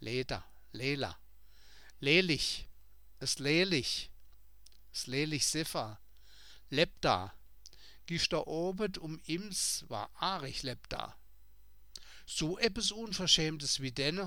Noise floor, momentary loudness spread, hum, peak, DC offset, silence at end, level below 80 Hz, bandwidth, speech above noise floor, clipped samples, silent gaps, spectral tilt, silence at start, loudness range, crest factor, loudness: -63 dBFS; 15 LU; none; -12 dBFS; 0.2%; 0 s; -56 dBFS; 19 kHz; 29 dB; under 0.1%; none; -3 dB/octave; 0 s; 5 LU; 24 dB; -33 LUFS